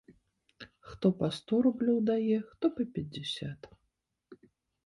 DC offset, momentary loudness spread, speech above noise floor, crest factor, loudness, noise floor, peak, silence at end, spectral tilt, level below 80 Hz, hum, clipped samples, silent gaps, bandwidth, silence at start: under 0.1%; 22 LU; 51 dB; 18 dB; -31 LUFS; -81 dBFS; -14 dBFS; 0.5 s; -7 dB/octave; -66 dBFS; none; under 0.1%; none; 11.5 kHz; 0.6 s